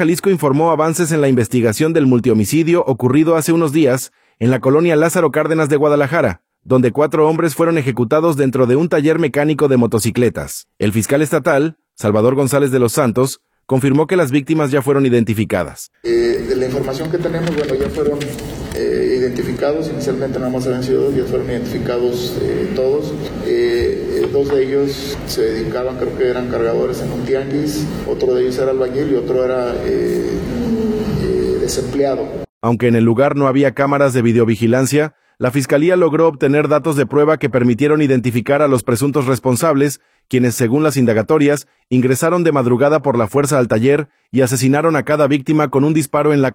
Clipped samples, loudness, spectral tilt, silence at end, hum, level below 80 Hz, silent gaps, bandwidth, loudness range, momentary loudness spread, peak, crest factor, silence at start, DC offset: under 0.1%; -15 LUFS; -6 dB/octave; 0 s; none; -42 dBFS; 32.49-32.61 s; 18 kHz; 4 LU; 7 LU; -2 dBFS; 14 dB; 0 s; under 0.1%